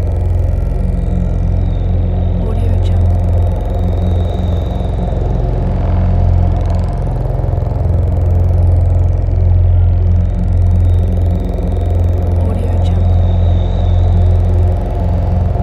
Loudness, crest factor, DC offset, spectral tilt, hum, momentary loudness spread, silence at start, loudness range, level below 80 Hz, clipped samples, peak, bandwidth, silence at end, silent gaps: -14 LUFS; 10 dB; under 0.1%; -9.5 dB/octave; none; 5 LU; 0 s; 3 LU; -16 dBFS; under 0.1%; -2 dBFS; 4.1 kHz; 0 s; none